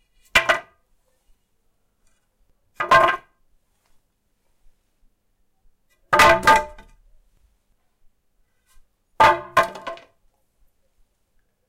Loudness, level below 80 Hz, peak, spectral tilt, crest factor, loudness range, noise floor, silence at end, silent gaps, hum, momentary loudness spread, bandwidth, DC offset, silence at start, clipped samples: -17 LUFS; -48 dBFS; -2 dBFS; -2.5 dB/octave; 22 dB; 3 LU; -68 dBFS; 1.75 s; none; none; 21 LU; 16.5 kHz; under 0.1%; 0.35 s; under 0.1%